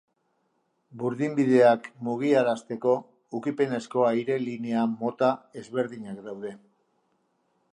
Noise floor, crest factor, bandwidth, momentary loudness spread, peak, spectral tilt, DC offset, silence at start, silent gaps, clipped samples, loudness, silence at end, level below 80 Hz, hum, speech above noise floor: -73 dBFS; 20 dB; 10.5 kHz; 16 LU; -8 dBFS; -7 dB/octave; under 0.1%; 0.95 s; none; under 0.1%; -26 LUFS; 1.15 s; -78 dBFS; none; 47 dB